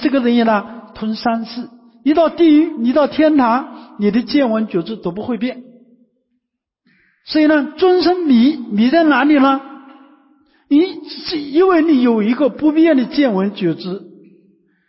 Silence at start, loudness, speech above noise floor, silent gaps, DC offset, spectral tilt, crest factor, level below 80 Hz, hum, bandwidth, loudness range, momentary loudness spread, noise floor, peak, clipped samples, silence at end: 0 s; -15 LUFS; 60 dB; none; under 0.1%; -10 dB/octave; 12 dB; -56 dBFS; none; 5.8 kHz; 7 LU; 12 LU; -74 dBFS; -4 dBFS; under 0.1%; 0.85 s